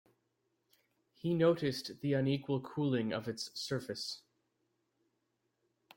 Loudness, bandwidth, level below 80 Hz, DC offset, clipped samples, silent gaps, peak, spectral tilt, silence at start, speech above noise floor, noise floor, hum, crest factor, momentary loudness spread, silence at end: -35 LUFS; 16.5 kHz; -74 dBFS; under 0.1%; under 0.1%; none; -18 dBFS; -6 dB/octave; 1.25 s; 48 dB; -82 dBFS; none; 20 dB; 11 LU; 1.8 s